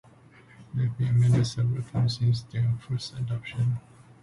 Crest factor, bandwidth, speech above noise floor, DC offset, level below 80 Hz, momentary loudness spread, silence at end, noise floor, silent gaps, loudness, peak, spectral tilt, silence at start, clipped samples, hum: 14 dB; 11.5 kHz; 28 dB; under 0.1%; -52 dBFS; 10 LU; 0.4 s; -53 dBFS; none; -27 LUFS; -12 dBFS; -7 dB/octave; 0.6 s; under 0.1%; none